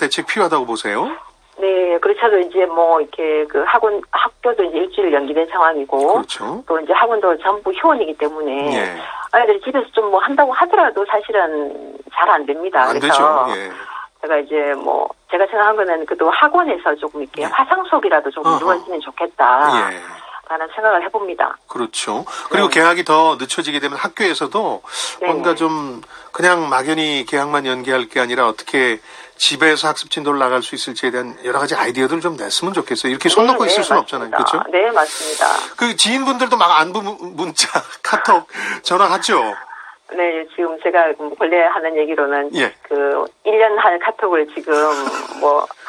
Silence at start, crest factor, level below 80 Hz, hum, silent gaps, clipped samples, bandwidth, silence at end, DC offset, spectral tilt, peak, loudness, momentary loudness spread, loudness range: 0 s; 16 dB; -62 dBFS; none; none; under 0.1%; 14 kHz; 0 s; under 0.1%; -2.5 dB/octave; 0 dBFS; -16 LUFS; 10 LU; 2 LU